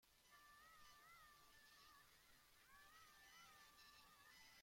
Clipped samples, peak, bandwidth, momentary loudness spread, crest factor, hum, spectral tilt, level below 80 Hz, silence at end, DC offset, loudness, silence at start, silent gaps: under 0.1%; -56 dBFS; 16.5 kHz; 3 LU; 14 dB; none; -0.5 dB/octave; -84 dBFS; 0 s; under 0.1%; -67 LUFS; 0 s; none